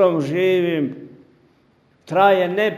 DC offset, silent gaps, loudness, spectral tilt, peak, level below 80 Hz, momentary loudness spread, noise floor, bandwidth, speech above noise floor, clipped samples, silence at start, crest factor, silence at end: under 0.1%; none; -18 LUFS; -7 dB/octave; 0 dBFS; -68 dBFS; 10 LU; -58 dBFS; 15 kHz; 41 dB; under 0.1%; 0 s; 18 dB; 0 s